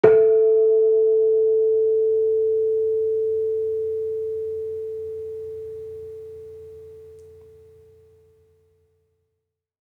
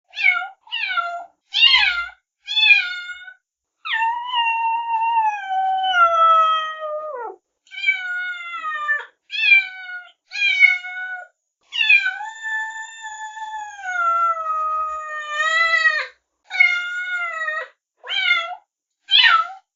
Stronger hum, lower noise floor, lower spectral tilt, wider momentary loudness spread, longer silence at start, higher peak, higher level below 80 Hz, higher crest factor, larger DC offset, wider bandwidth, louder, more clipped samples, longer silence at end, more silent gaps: neither; first, -79 dBFS vs -67 dBFS; first, -8.5 dB/octave vs 7 dB/octave; about the same, 21 LU vs 19 LU; about the same, 0.05 s vs 0.15 s; about the same, -2 dBFS vs 0 dBFS; about the same, -68 dBFS vs -64 dBFS; about the same, 20 dB vs 20 dB; neither; second, 3.2 kHz vs 7.6 kHz; about the same, -20 LUFS vs -18 LUFS; neither; first, 2.65 s vs 0.15 s; neither